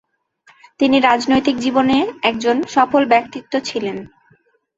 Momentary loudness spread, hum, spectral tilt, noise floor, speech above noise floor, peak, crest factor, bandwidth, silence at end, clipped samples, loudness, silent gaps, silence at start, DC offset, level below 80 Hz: 10 LU; none; -4.5 dB/octave; -57 dBFS; 41 dB; 0 dBFS; 16 dB; 8 kHz; 0.7 s; under 0.1%; -16 LUFS; none; 0.8 s; under 0.1%; -54 dBFS